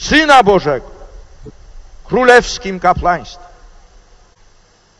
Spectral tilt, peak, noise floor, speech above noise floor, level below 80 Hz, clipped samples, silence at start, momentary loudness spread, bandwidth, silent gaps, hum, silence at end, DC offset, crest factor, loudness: -4 dB/octave; 0 dBFS; -49 dBFS; 38 dB; -34 dBFS; 0.8%; 0 s; 13 LU; 11 kHz; none; none; 1.55 s; under 0.1%; 14 dB; -11 LUFS